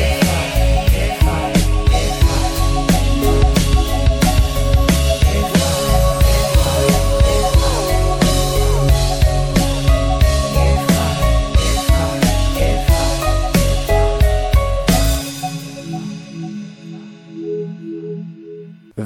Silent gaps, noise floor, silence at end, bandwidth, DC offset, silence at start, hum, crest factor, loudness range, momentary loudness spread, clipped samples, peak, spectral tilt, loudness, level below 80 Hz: none; -35 dBFS; 0 s; 17 kHz; under 0.1%; 0 s; none; 14 dB; 6 LU; 14 LU; under 0.1%; 0 dBFS; -5 dB/octave; -16 LUFS; -18 dBFS